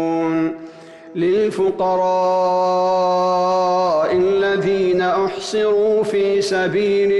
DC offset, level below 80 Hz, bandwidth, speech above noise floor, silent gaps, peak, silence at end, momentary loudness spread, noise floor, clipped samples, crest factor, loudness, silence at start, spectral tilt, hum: under 0.1%; -56 dBFS; 11.5 kHz; 22 dB; none; -10 dBFS; 0 s; 4 LU; -38 dBFS; under 0.1%; 8 dB; -17 LUFS; 0 s; -5.5 dB/octave; none